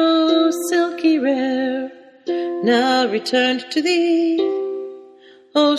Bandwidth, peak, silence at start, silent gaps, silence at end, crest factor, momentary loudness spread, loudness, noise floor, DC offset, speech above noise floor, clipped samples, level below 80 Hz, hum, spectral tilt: 13 kHz; -4 dBFS; 0 s; none; 0 s; 14 dB; 11 LU; -18 LUFS; -46 dBFS; under 0.1%; 29 dB; under 0.1%; -66 dBFS; none; -3.5 dB/octave